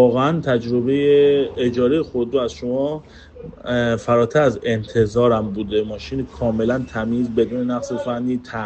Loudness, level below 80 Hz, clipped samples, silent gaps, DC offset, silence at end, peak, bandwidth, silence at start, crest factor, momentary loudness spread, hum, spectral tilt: -19 LUFS; -46 dBFS; under 0.1%; none; under 0.1%; 0 s; -4 dBFS; 8.4 kHz; 0 s; 16 dB; 9 LU; none; -7 dB/octave